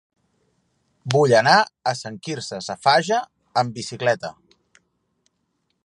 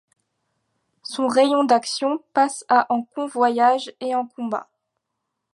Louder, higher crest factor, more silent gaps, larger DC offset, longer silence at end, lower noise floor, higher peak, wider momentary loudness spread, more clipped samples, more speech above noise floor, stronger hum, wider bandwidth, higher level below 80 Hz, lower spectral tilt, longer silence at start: about the same, -20 LUFS vs -21 LUFS; about the same, 22 dB vs 18 dB; neither; neither; first, 1.55 s vs 0.9 s; second, -72 dBFS vs -79 dBFS; first, 0 dBFS vs -4 dBFS; first, 15 LU vs 11 LU; neither; second, 52 dB vs 59 dB; neither; about the same, 11.5 kHz vs 11.5 kHz; first, -68 dBFS vs -76 dBFS; about the same, -4 dB/octave vs -3 dB/octave; about the same, 1.05 s vs 1.05 s